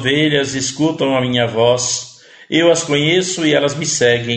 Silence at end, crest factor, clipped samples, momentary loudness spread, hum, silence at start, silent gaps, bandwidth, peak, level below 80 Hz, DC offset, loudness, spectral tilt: 0 s; 16 dB; under 0.1%; 6 LU; none; 0 s; none; 9.2 kHz; 0 dBFS; -52 dBFS; under 0.1%; -15 LUFS; -3.5 dB/octave